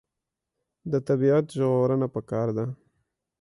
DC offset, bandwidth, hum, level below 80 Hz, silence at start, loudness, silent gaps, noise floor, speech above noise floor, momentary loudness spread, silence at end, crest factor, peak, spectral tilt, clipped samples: under 0.1%; 11.5 kHz; none; -64 dBFS; 0.85 s; -25 LUFS; none; -86 dBFS; 61 dB; 12 LU; 0.7 s; 14 dB; -12 dBFS; -9 dB/octave; under 0.1%